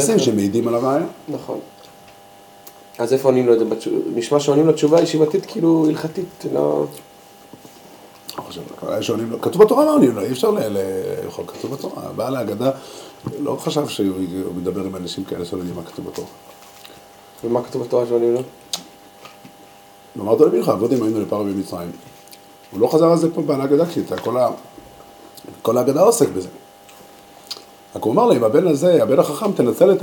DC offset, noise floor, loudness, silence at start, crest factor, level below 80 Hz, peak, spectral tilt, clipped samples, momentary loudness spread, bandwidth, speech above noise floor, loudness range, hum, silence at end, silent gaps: under 0.1%; -45 dBFS; -18 LUFS; 0 s; 18 dB; -62 dBFS; 0 dBFS; -6 dB/octave; under 0.1%; 18 LU; 17.5 kHz; 27 dB; 7 LU; none; 0 s; none